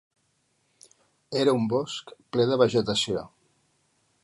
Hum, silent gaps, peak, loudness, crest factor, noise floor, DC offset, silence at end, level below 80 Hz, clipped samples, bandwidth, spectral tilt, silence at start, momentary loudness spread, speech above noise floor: none; none; -6 dBFS; -25 LUFS; 22 dB; -71 dBFS; under 0.1%; 0.95 s; -64 dBFS; under 0.1%; 11.5 kHz; -5 dB/octave; 1.3 s; 13 LU; 46 dB